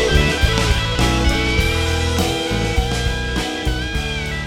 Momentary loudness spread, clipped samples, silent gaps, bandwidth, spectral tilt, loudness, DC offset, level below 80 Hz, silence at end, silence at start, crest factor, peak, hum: 6 LU; under 0.1%; none; 17 kHz; -4.5 dB/octave; -18 LUFS; under 0.1%; -22 dBFS; 0 s; 0 s; 18 dB; 0 dBFS; none